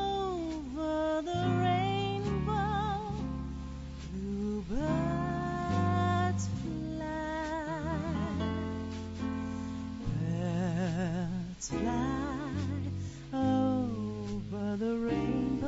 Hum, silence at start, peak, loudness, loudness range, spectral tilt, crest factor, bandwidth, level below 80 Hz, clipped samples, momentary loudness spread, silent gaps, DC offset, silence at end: none; 0 s; -18 dBFS; -34 LUFS; 3 LU; -6.5 dB/octave; 16 dB; 7.6 kHz; -46 dBFS; under 0.1%; 9 LU; none; under 0.1%; 0 s